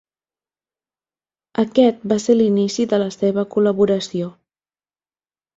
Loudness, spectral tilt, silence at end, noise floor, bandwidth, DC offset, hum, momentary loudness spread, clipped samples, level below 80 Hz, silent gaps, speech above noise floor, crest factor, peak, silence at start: -18 LUFS; -6 dB/octave; 1.25 s; under -90 dBFS; 7.8 kHz; under 0.1%; none; 10 LU; under 0.1%; -62 dBFS; none; over 73 dB; 18 dB; -2 dBFS; 1.6 s